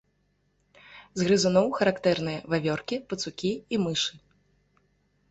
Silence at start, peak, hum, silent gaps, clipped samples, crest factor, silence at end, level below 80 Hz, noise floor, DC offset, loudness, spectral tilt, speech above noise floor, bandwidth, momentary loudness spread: 0.9 s; -10 dBFS; none; none; under 0.1%; 20 dB; 1.15 s; -62 dBFS; -71 dBFS; under 0.1%; -27 LUFS; -4.5 dB/octave; 44 dB; 8.2 kHz; 9 LU